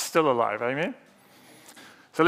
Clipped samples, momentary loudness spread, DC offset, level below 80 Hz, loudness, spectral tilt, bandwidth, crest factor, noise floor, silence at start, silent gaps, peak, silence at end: under 0.1%; 25 LU; under 0.1%; -84 dBFS; -26 LUFS; -4.5 dB/octave; 16 kHz; 22 dB; -54 dBFS; 0 s; none; -6 dBFS; 0 s